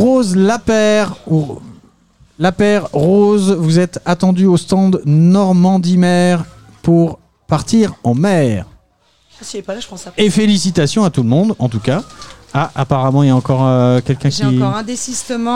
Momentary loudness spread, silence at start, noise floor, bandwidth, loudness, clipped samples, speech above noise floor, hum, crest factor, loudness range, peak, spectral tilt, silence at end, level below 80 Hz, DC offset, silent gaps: 10 LU; 0 s; -55 dBFS; 12 kHz; -13 LUFS; under 0.1%; 43 dB; none; 12 dB; 4 LU; -2 dBFS; -6.5 dB/octave; 0 s; -44 dBFS; 0.9%; none